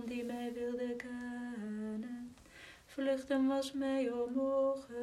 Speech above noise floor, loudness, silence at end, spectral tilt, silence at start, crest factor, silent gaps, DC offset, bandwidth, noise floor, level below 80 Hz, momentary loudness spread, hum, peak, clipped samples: 22 dB; -37 LUFS; 0 s; -5 dB/octave; 0 s; 14 dB; none; under 0.1%; 13.5 kHz; -57 dBFS; -70 dBFS; 15 LU; none; -24 dBFS; under 0.1%